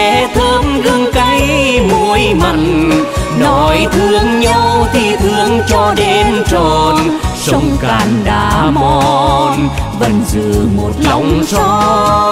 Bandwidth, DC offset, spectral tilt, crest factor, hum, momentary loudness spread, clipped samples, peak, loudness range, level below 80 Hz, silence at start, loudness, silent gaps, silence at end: 16 kHz; under 0.1%; -5 dB/octave; 10 dB; none; 3 LU; under 0.1%; 0 dBFS; 1 LU; -22 dBFS; 0 s; -11 LUFS; none; 0 s